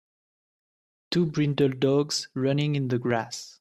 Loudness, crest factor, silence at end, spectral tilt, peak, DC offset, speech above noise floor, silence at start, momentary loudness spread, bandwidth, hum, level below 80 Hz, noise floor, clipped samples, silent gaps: -26 LUFS; 16 dB; 0.1 s; -6 dB/octave; -10 dBFS; under 0.1%; over 65 dB; 1.1 s; 5 LU; 13 kHz; none; -64 dBFS; under -90 dBFS; under 0.1%; none